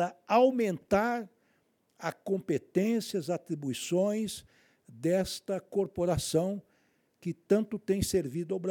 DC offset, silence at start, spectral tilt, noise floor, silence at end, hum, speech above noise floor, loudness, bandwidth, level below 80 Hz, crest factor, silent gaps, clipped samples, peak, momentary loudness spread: under 0.1%; 0 s; -5.5 dB/octave; -72 dBFS; 0 s; none; 42 dB; -31 LUFS; 19 kHz; -58 dBFS; 20 dB; none; under 0.1%; -12 dBFS; 11 LU